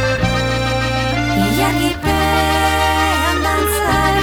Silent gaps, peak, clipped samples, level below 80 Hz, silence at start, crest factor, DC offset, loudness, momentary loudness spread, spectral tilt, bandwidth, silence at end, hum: none; -4 dBFS; under 0.1%; -26 dBFS; 0 s; 12 dB; under 0.1%; -15 LUFS; 3 LU; -4.5 dB/octave; over 20 kHz; 0 s; none